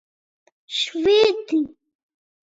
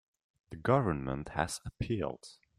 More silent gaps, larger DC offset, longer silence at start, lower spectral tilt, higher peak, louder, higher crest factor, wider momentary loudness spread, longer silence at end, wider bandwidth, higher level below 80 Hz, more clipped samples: neither; neither; first, 0.7 s vs 0.5 s; second, -3 dB/octave vs -6 dB/octave; first, -6 dBFS vs -12 dBFS; first, -20 LUFS vs -34 LUFS; second, 16 dB vs 22 dB; about the same, 11 LU vs 11 LU; first, 0.85 s vs 0.25 s; second, 7.8 kHz vs 14 kHz; second, -60 dBFS vs -54 dBFS; neither